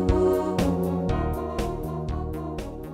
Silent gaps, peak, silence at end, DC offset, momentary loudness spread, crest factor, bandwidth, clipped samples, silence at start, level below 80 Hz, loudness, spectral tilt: none; -8 dBFS; 0 s; under 0.1%; 10 LU; 18 dB; 16 kHz; under 0.1%; 0 s; -34 dBFS; -27 LUFS; -7.5 dB/octave